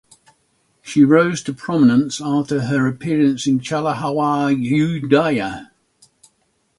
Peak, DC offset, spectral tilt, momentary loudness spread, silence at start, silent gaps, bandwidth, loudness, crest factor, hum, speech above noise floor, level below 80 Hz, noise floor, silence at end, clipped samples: 0 dBFS; under 0.1%; -6 dB/octave; 9 LU; 0.85 s; none; 11.5 kHz; -17 LUFS; 18 dB; none; 48 dB; -56 dBFS; -65 dBFS; 1.15 s; under 0.1%